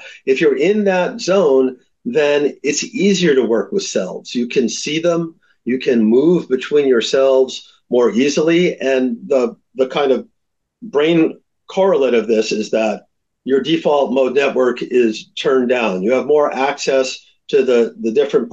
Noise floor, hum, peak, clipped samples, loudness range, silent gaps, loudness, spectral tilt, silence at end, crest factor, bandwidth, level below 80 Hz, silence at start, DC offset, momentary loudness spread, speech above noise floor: -72 dBFS; none; -4 dBFS; under 0.1%; 2 LU; none; -16 LUFS; -5 dB/octave; 0.05 s; 12 dB; 8.2 kHz; -66 dBFS; 0 s; under 0.1%; 8 LU; 57 dB